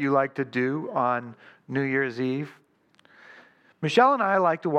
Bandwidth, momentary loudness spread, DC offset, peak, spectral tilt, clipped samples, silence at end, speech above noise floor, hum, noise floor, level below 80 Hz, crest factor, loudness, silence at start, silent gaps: 9.2 kHz; 12 LU; under 0.1%; -6 dBFS; -6.5 dB/octave; under 0.1%; 0 s; 37 dB; none; -61 dBFS; -80 dBFS; 20 dB; -25 LUFS; 0 s; none